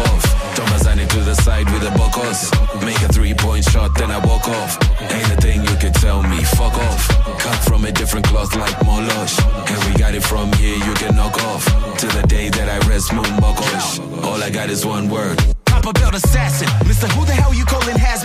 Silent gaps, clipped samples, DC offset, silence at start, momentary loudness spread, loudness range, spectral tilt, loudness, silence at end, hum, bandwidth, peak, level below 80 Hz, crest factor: none; under 0.1%; under 0.1%; 0 s; 3 LU; 1 LU; -4.5 dB/octave; -16 LUFS; 0 s; none; 15.5 kHz; -2 dBFS; -16 dBFS; 12 dB